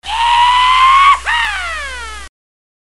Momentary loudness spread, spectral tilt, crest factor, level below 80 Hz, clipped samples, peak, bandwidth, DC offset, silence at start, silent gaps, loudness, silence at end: 18 LU; 0.5 dB/octave; 12 dB; -36 dBFS; under 0.1%; 0 dBFS; 12 kHz; 2%; 0 s; none; -10 LUFS; 0.65 s